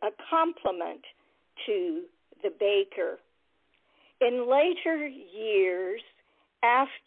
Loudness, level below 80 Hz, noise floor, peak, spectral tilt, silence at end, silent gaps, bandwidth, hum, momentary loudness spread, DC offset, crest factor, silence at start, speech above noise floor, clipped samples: -28 LUFS; -74 dBFS; -72 dBFS; -10 dBFS; -7 dB/octave; 0.1 s; none; 4.1 kHz; none; 14 LU; under 0.1%; 18 dB; 0 s; 45 dB; under 0.1%